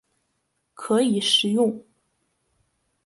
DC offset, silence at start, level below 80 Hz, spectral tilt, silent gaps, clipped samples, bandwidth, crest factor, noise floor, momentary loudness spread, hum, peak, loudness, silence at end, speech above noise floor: under 0.1%; 0.8 s; -72 dBFS; -4 dB/octave; none; under 0.1%; 11.5 kHz; 20 dB; -74 dBFS; 17 LU; none; -6 dBFS; -21 LUFS; 1.25 s; 53 dB